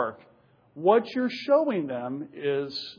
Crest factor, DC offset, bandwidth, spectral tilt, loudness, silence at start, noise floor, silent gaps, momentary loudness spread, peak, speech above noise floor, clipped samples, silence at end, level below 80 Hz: 20 dB; under 0.1%; 5.4 kHz; -7 dB/octave; -26 LUFS; 0 s; -60 dBFS; none; 10 LU; -8 dBFS; 34 dB; under 0.1%; 0.05 s; -80 dBFS